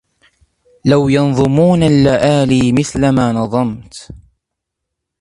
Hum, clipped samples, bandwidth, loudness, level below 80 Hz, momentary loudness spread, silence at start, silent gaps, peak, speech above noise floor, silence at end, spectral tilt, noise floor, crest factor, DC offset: none; under 0.1%; 11.5 kHz; -13 LUFS; -40 dBFS; 10 LU; 0.85 s; none; 0 dBFS; 66 dB; 1.05 s; -7 dB/octave; -77 dBFS; 14 dB; under 0.1%